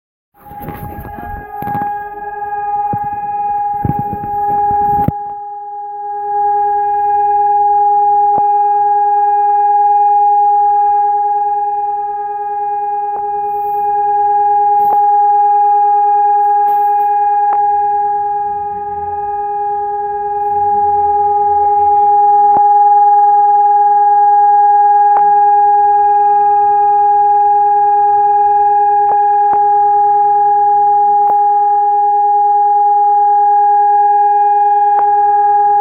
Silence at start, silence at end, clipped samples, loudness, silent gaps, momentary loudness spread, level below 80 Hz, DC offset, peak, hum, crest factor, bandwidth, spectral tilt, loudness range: 0.45 s; 0 s; under 0.1%; -11 LUFS; none; 10 LU; -46 dBFS; under 0.1%; 0 dBFS; none; 10 dB; 2.6 kHz; -9.5 dB/octave; 7 LU